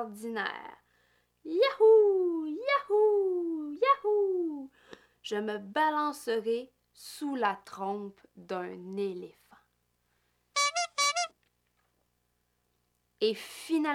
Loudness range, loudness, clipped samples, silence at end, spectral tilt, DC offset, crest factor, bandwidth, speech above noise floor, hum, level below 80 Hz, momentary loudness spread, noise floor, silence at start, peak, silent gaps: 10 LU; -30 LUFS; under 0.1%; 0 s; -3 dB/octave; under 0.1%; 18 dB; 15 kHz; 47 dB; 60 Hz at -75 dBFS; -80 dBFS; 17 LU; -76 dBFS; 0 s; -14 dBFS; none